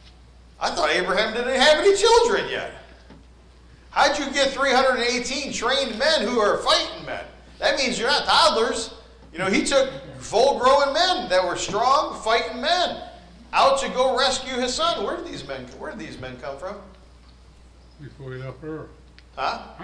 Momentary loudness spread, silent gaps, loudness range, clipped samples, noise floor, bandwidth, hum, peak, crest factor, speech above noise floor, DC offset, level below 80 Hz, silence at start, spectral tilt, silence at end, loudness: 18 LU; none; 14 LU; under 0.1%; -49 dBFS; 10.5 kHz; none; -6 dBFS; 16 dB; 27 dB; under 0.1%; -48 dBFS; 0.05 s; -2.5 dB/octave; 0 s; -21 LUFS